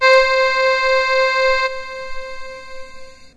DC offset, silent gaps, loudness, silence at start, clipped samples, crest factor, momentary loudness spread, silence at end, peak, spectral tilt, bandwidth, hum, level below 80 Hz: under 0.1%; none; -15 LUFS; 0 s; under 0.1%; 18 dB; 21 LU; 0.1 s; 0 dBFS; 0 dB/octave; 11 kHz; none; -40 dBFS